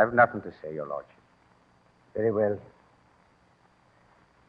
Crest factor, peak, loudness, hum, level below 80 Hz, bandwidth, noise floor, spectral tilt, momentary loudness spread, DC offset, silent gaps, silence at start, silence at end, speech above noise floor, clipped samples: 24 dB; -6 dBFS; -28 LUFS; none; -68 dBFS; 5.4 kHz; -63 dBFS; -9.5 dB/octave; 16 LU; under 0.1%; none; 0 s; 1.85 s; 36 dB; under 0.1%